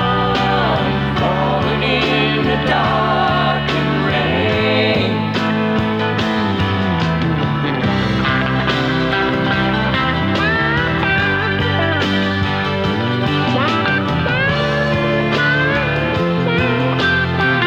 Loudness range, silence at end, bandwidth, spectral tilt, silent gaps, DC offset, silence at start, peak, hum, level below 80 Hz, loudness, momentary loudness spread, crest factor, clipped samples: 1 LU; 0 s; 9.2 kHz; -6.5 dB/octave; none; under 0.1%; 0 s; -2 dBFS; none; -36 dBFS; -16 LUFS; 3 LU; 14 dB; under 0.1%